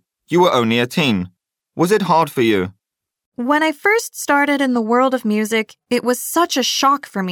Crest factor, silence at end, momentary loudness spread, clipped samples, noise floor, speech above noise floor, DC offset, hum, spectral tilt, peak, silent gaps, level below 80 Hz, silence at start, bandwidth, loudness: 14 dB; 0 s; 7 LU; under 0.1%; -79 dBFS; 63 dB; under 0.1%; none; -4 dB/octave; -4 dBFS; 3.26-3.32 s; -64 dBFS; 0.3 s; 18.5 kHz; -17 LUFS